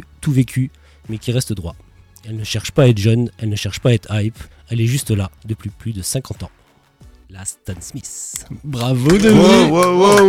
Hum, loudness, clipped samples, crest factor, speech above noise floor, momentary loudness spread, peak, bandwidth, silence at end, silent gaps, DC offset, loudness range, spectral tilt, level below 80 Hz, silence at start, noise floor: none; -16 LUFS; under 0.1%; 14 dB; 33 dB; 19 LU; -2 dBFS; 17 kHz; 0 s; none; under 0.1%; 11 LU; -5.5 dB/octave; -40 dBFS; 0.2 s; -48 dBFS